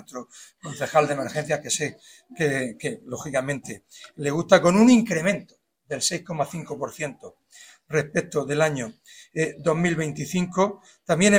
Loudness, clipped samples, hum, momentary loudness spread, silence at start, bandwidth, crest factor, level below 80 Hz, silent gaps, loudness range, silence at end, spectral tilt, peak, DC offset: -24 LUFS; under 0.1%; none; 17 LU; 0.15 s; 16 kHz; 24 dB; -60 dBFS; none; 6 LU; 0 s; -4.5 dB/octave; 0 dBFS; under 0.1%